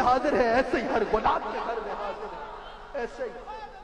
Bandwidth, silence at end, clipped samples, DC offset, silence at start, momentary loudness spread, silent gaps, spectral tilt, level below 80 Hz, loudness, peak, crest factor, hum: 10.5 kHz; 0 s; under 0.1%; under 0.1%; 0 s; 17 LU; none; -5.5 dB/octave; -46 dBFS; -28 LUFS; -12 dBFS; 16 dB; none